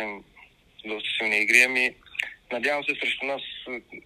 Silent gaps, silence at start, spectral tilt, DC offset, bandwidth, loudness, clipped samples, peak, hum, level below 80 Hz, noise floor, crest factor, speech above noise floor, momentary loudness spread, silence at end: none; 0 s; -1 dB/octave; under 0.1%; 16 kHz; -23 LUFS; under 0.1%; -4 dBFS; none; -66 dBFS; -52 dBFS; 24 dB; 26 dB; 18 LU; 0.05 s